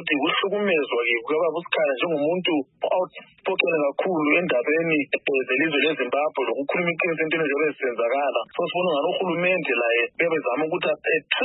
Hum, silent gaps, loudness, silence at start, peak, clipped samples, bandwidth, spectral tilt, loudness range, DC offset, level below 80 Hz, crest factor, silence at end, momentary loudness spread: none; none; -23 LUFS; 0 s; -4 dBFS; under 0.1%; 4.1 kHz; -9.5 dB/octave; 1 LU; under 0.1%; -76 dBFS; 20 dB; 0 s; 4 LU